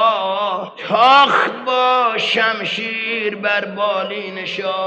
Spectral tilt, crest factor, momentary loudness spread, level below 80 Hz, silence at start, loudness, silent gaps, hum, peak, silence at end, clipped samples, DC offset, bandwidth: -3.5 dB/octave; 16 dB; 12 LU; -68 dBFS; 0 s; -16 LUFS; none; none; 0 dBFS; 0 s; under 0.1%; under 0.1%; 9.2 kHz